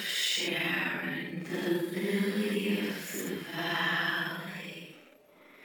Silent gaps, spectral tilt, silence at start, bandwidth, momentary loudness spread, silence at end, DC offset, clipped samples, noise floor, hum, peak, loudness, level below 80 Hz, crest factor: none; -3.5 dB/octave; 0 s; over 20 kHz; 11 LU; 0 s; under 0.1%; under 0.1%; -58 dBFS; none; -16 dBFS; -31 LUFS; -80 dBFS; 16 dB